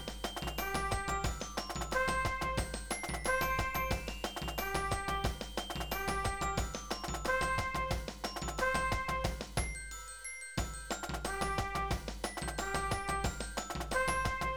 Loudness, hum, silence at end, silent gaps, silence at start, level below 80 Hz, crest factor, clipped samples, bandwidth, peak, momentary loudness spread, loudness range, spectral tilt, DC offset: -36 LUFS; none; 0 s; none; 0 s; -44 dBFS; 18 dB; under 0.1%; over 20 kHz; -18 dBFS; 7 LU; 3 LU; -3.5 dB/octave; 0.2%